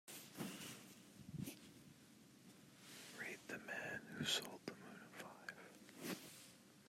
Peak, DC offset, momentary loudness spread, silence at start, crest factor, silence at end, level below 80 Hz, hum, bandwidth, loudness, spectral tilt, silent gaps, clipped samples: -28 dBFS; under 0.1%; 20 LU; 0.05 s; 26 dB; 0 s; -86 dBFS; none; 16 kHz; -50 LUFS; -3 dB/octave; none; under 0.1%